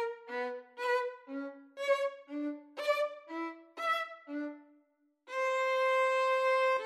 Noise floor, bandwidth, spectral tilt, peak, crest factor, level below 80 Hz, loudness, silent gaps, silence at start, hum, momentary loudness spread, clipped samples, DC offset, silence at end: -72 dBFS; 13 kHz; -1 dB/octave; -18 dBFS; 16 dB; under -90 dBFS; -34 LUFS; none; 0 s; none; 14 LU; under 0.1%; under 0.1%; 0 s